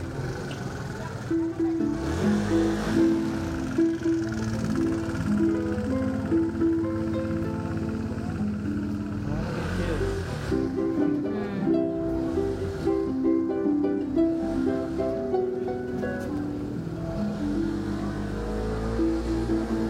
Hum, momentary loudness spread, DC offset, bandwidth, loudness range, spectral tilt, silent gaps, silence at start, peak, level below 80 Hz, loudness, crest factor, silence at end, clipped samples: none; 6 LU; under 0.1%; 12 kHz; 4 LU; -7.5 dB/octave; none; 0 s; -12 dBFS; -40 dBFS; -27 LUFS; 14 dB; 0 s; under 0.1%